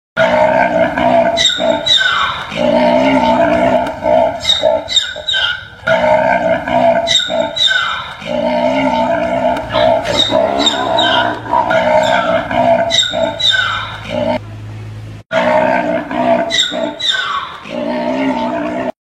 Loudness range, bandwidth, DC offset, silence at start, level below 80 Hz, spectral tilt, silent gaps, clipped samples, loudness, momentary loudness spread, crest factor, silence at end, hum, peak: 4 LU; 12 kHz; under 0.1%; 0.15 s; -42 dBFS; -3.5 dB/octave; none; under 0.1%; -13 LUFS; 8 LU; 14 dB; 0.15 s; none; 0 dBFS